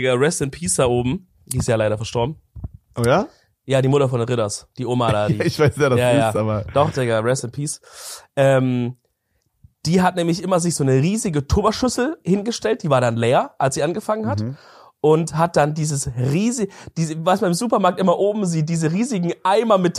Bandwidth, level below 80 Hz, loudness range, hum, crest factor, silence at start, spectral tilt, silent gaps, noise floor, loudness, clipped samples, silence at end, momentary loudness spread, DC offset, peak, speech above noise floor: 15 kHz; -44 dBFS; 2 LU; none; 18 dB; 0 s; -5.5 dB/octave; none; -69 dBFS; -19 LUFS; under 0.1%; 0 s; 10 LU; under 0.1%; -2 dBFS; 50 dB